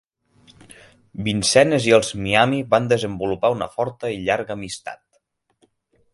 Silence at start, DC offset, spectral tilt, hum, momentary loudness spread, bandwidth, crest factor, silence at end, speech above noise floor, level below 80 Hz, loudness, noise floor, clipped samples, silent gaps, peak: 1.15 s; under 0.1%; -4 dB/octave; none; 14 LU; 11.5 kHz; 22 dB; 1.2 s; 48 dB; -52 dBFS; -20 LUFS; -67 dBFS; under 0.1%; none; 0 dBFS